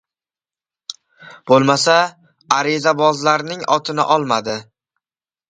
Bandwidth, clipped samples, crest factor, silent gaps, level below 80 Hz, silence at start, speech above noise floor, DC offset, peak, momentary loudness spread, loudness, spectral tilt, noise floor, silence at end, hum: 9.4 kHz; under 0.1%; 18 dB; none; -64 dBFS; 0.9 s; over 74 dB; under 0.1%; 0 dBFS; 20 LU; -16 LUFS; -4 dB/octave; under -90 dBFS; 0.85 s; none